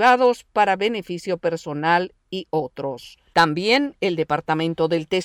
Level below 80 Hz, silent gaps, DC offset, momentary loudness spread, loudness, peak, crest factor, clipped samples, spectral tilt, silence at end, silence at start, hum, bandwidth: -60 dBFS; none; under 0.1%; 11 LU; -21 LUFS; -6 dBFS; 14 dB; under 0.1%; -5 dB/octave; 0 s; 0 s; none; 15 kHz